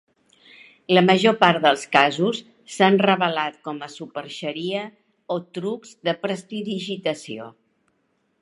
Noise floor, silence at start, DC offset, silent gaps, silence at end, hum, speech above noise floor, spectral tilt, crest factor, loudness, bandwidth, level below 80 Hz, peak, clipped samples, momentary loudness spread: -69 dBFS; 0.9 s; under 0.1%; none; 0.9 s; none; 48 dB; -5 dB/octave; 22 dB; -21 LUFS; 11.5 kHz; -72 dBFS; 0 dBFS; under 0.1%; 17 LU